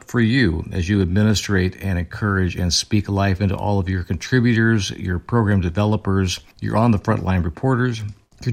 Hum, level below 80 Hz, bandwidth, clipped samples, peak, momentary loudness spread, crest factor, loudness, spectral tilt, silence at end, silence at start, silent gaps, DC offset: none; -42 dBFS; 14.5 kHz; under 0.1%; -4 dBFS; 7 LU; 14 dB; -20 LUFS; -5.5 dB/octave; 0 s; 0.1 s; none; under 0.1%